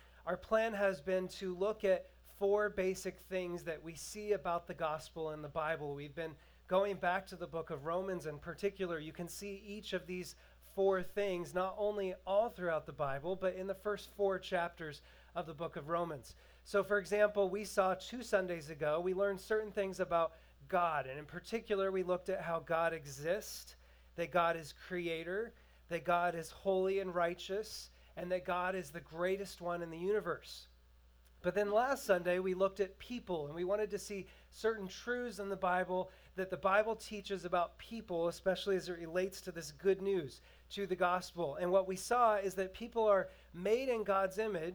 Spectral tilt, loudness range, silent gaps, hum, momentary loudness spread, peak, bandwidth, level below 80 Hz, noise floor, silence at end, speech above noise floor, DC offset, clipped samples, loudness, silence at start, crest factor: -5 dB/octave; 4 LU; none; none; 12 LU; -18 dBFS; over 20 kHz; -64 dBFS; -64 dBFS; 0 s; 27 dB; under 0.1%; under 0.1%; -38 LUFS; 0.2 s; 20 dB